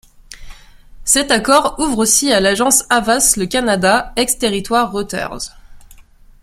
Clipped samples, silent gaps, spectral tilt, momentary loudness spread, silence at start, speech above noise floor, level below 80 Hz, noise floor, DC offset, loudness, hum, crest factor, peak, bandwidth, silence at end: under 0.1%; none; -2 dB/octave; 11 LU; 0.3 s; 28 dB; -38 dBFS; -43 dBFS; under 0.1%; -14 LUFS; none; 16 dB; 0 dBFS; 16.5 kHz; 0.45 s